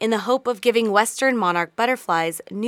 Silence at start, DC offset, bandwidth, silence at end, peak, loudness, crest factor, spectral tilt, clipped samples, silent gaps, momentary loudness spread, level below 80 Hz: 0 s; under 0.1%; 17 kHz; 0 s; -2 dBFS; -20 LUFS; 18 dB; -3.5 dB/octave; under 0.1%; none; 4 LU; -74 dBFS